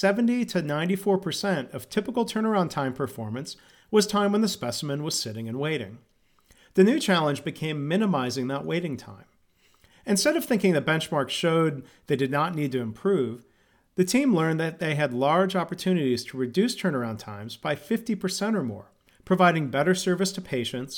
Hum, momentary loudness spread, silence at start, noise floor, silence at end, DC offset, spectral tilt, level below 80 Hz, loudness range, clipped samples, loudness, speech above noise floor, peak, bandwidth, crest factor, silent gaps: none; 10 LU; 0 s; -63 dBFS; 0 s; under 0.1%; -5 dB/octave; -66 dBFS; 2 LU; under 0.1%; -26 LUFS; 38 dB; -6 dBFS; 19 kHz; 20 dB; none